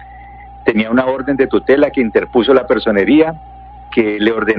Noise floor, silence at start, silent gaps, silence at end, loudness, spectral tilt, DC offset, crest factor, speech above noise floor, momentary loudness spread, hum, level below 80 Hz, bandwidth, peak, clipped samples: -35 dBFS; 0 s; none; 0 s; -14 LUFS; -8 dB/octave; under 0.1%; 14 dB; 22 dB; 5 LU; none; -40 dBFS; 5.2 kHz; 0 dBFS; under 0.1%